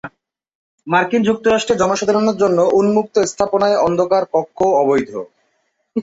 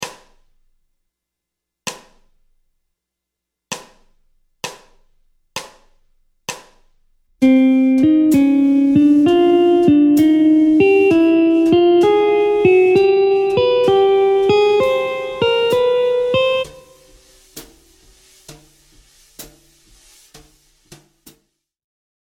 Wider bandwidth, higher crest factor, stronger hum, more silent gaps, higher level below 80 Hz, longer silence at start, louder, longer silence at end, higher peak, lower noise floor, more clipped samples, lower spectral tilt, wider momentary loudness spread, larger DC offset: second, 8 kHz vs 16.5 kHz; about the same, 14 dB vs 16 dB; neither; first, 0.55-0.78 s vs none; about the same, -52 dBFS vs -52 dBFS; about the same, 0.05 s vs 0 s; second, -16 LUFS vs -13 LUFS; second, 0 s vs 2.8 s; about the same, -2 dBFS vs 0 dBFS; second, -66 dBFS vs -82 dBFS; neither; about the same, -5 dB/octave vs -5.5 dB/octave; second, 6 LU vs 19 LU; neither